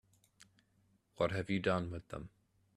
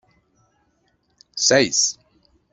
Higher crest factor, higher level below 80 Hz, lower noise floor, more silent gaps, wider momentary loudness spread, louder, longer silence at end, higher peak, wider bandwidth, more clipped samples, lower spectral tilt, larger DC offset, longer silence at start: about the same, 22 dB vs 22 dB; about the same, -64 dBFS vs -62 dBFS; first, -74 dBFS vs -66 dBFS; neither; second, 15 LU vs 20 LU; second, -37 LUFS vs -17 LUFS; about the same, 0.5 s vs 0.6 s; second, -18 dBFS vs -2 dBFS; first, 12 kHz vs 8.2 kHz; neither; first, -6.5 dB/octave vs -1.5 dB/octave; neither; second, 1.2 s vs 1.35 s